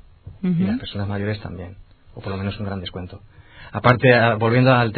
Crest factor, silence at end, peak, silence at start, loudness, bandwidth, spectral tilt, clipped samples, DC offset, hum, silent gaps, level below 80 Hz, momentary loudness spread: 20 dB; 0 s; 0 dBFS; 0.25 s; -20 LUFS; 6 kHz; -9.5 dB/octave; under 0.1%; under 0.1%; none; none; -48 dBFS; 20 LU